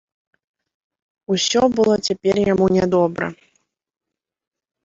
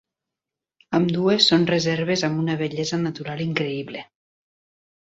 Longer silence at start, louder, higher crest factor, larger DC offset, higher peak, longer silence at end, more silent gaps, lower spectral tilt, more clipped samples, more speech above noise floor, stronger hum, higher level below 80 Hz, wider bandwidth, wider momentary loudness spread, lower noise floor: first, 1.3 s vs 0.9 s; first, -18 LUFS vs -22 LUFS; about the same, 18 dB vs 20 dB; neither; about the same, -4 dBFS vs -4 dBFS; first, 1.5 s vs 1 s; neither; about the same, -5 dB/octave vs -5 dB/octave; neither; second, 49 dB vs 66 dB; neither; first, -52 dBFS vs -62 dBFS; about the same, 8 kHz vs 8 kHz; second, 7 LU vs 12 LU; second, -67 dBFS vs -87 dBFS